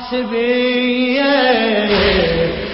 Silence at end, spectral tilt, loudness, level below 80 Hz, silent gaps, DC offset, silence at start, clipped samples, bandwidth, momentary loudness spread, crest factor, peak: 0 s; -9.5 dB/octave; -14 LUFS; -34 dBFS; none; under 0.1%; 0 s; under 0.1%; 5.8 kHz; 5 LU; 14 dB; -2 dBFS